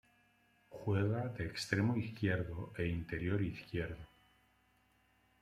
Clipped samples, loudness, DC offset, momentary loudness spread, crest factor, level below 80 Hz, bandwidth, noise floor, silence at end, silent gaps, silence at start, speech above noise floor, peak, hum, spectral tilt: under 0.1%; -38 LUFS; under 0.1%; 9 LU; 22 dB; -60 dBFS; 13.5 kHz; -73 dBFS; 1.35 s; none; 0.7 s; 36 dB; -18 dBFS; 50 Hz at -55 dBFS; -6.5 dB/octave